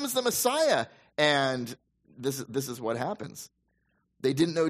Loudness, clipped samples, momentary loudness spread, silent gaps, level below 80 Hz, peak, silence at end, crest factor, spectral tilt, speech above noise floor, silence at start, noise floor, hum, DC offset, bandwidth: -28 LUFS; under 0.1%; 17 LU; none; -70 dBFS; -10 dBFS; 0 s; 20 dB; -3.5 dB/octave; 46 dB; 0 s; -74 dBFS; none; under 0.1%; 15.5 kHz